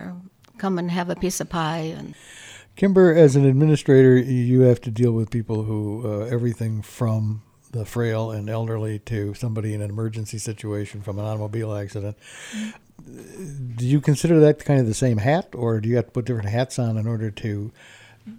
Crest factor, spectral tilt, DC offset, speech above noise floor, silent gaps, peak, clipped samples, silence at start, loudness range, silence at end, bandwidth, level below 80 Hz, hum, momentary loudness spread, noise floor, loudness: 18 dB; -7 dB/octave; under 0.1%; 20 dB; none; -2 dBFS; under 0.1%; 0 s; 12 LU; 0 s; 15.5 kHz; -52 dBFS; none; 18 LU; -41 dBFS; -21 LUFS